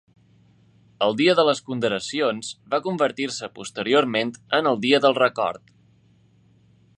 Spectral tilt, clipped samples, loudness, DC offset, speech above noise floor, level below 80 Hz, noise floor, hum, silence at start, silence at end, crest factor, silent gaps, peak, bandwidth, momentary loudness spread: -4 dB/octave; under 0.1%; -22 LUFS; under 0.1%; 36 dB; -68 dBFS; -58 dBFS; none; 1 s; 1.4 s; 20 dB; none; -4 dBFS; 11 kHz; 11 LU